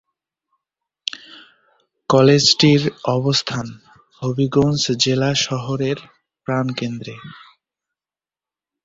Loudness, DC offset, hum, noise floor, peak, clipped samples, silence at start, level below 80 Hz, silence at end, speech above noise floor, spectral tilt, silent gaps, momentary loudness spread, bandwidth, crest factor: -18 LUFS; under 0.1%; none; under -90 dBFS; -2 dBFS; under 0.1%; 1.15 s; -54 dBFS; 1.45 s; over 72 dB; -4.5 dB/octave; none; 20 LU; 7.8 kHz; 20 dB